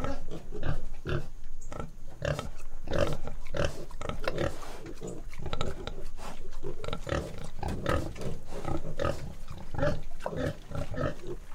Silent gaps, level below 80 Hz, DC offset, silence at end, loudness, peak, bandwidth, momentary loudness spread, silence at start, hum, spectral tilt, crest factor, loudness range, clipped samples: none; -36 dBFS; under 0.1%; 0 s; -36 LUFS; -12 dBFS; 9.6 kHz; 12 LU; 0 s; none; -6 dB/octave; 16 dB; 3 LU; under 0.1%